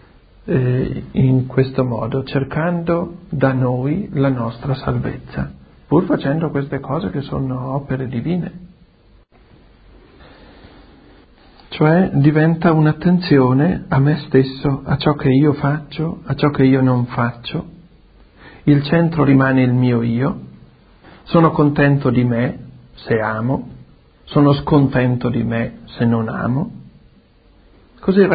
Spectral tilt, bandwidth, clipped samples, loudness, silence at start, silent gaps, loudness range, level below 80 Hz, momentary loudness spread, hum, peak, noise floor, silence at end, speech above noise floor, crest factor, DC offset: -13 dB/octave; 5 kHz; under 0.1%; -17 LUFS; 0.45 s; none; 7 LU; -42 dBFS; 10 LU; none; 0 dBFS; -50 dBFS; 0 s; 34 dB; 18 dB; under 0.1%